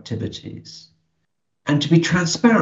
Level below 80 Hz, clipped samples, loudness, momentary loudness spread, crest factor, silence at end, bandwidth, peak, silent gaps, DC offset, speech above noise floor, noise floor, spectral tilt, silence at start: -56 dBFS; under 0.1%; -19 LUFS; 20 LU; 18 dB; 0 s; 8 kHz; -2 dBFS; none; under 0.1%; 57 dB; -76 dBFS; -5.5 dB/octave; 0.05 s